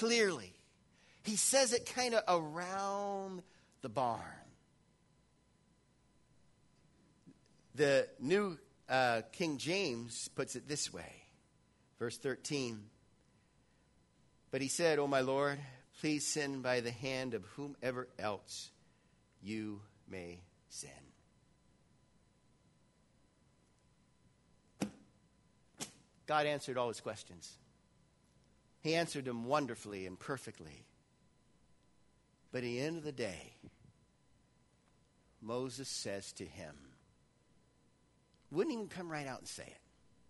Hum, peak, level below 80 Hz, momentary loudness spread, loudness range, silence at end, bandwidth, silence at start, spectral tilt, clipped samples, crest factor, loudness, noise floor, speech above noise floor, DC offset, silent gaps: none; -18 dBFS; -76 dBFS; 19 LU; 14 LU; 0.55 s; 11.5 kHz; 0 s; -3.5 dB/octave; under 0.1%; 24 dB; -38 LUFS; -72 dBFS; 34 dB; under 0.1%; none